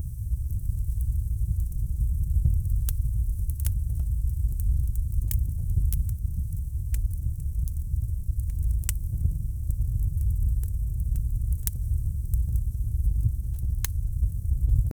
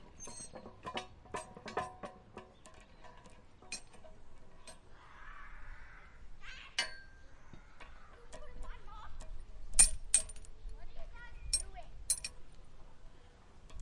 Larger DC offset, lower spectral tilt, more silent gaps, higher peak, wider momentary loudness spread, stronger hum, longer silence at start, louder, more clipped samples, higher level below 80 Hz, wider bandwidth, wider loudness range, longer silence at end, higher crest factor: neither; first, -6 dB/octave vs -0.5 dB/octave; neither; first, -6 dBFS vs -10 dBFS; second, 4 LU vs 26 LU; neither; about the same, 0 s vs 0 s; first, -29 LUFS vs -35 LUFS; neither; first, -26 dBFS vs -50 dBFS; first, over 20 kHz vs 11.5 kHz; second, 2 LU vs 20 LU; about the same, 0.05 s vs 0 s; second, 20 dB vs 30 dB